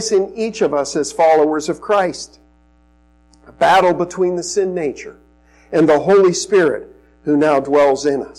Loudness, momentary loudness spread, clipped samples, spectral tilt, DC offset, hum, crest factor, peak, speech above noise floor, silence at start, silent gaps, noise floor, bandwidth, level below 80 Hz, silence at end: -15 LUFS; 11 LU; under 0.1%; -4.5 dB/octave; under 0.1%; none; 12 dB; -4 dBFS; 37 dB; 0 s; none; -52 dBFS; 12 kHz; -52 dBFS; 0.05 s